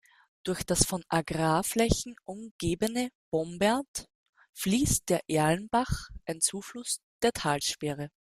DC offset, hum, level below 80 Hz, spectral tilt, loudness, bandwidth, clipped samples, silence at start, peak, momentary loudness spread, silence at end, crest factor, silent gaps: under 0.1%; none; -46 dBFS; -4 dB/octave; -29 LUFS; 15.5 kHz; under 0.1%; 0.45 s; -6 dBFS; 12 LU; 0.3 s; 24 dB; 2.51-2.59 s, 3.15-3.32 s, 3.88-3.94 s, 4.15-4.33 s, 4.49-4.53 s, 7.03-7.20 s